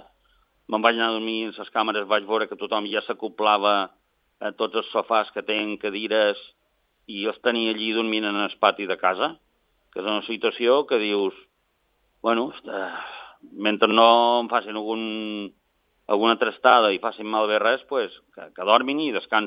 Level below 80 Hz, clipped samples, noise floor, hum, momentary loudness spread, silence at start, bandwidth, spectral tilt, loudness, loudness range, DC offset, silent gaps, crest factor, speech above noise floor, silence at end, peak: -72 dBFS; under 0.1%; -70 dBFS; none; 13 LU; 0.7 s; 5.4 kHz; -7 dB/octave; -23 LUFS; 4 LU; under 0.1%; none; 24 dB; 47 dB; 0 s; 0 dBFS